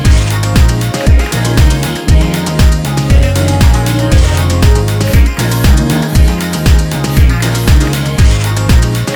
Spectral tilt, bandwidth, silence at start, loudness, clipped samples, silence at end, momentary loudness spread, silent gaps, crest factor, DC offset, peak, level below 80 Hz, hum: -5.5 dB/octave; over 20 kHz; 0 s; -10 LUFS; under 0.1%; 0 s; 2 LU; none; 8 dB; under 0.1%; 0 dBFS; -12 dBFS; none